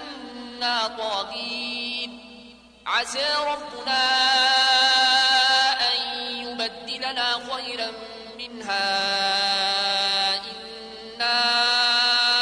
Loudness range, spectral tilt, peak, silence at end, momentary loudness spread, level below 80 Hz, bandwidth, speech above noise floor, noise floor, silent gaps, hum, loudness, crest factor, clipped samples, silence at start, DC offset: 8 LU; 0 dB/octave; -8 dBFS; 0 s; 18 LU; -62 dBFS; 11 kHz; 24 dB; -47 dBFS; none; none; -21 LUFS; 16 dB; under 0.1%; 0 s; under 0.1%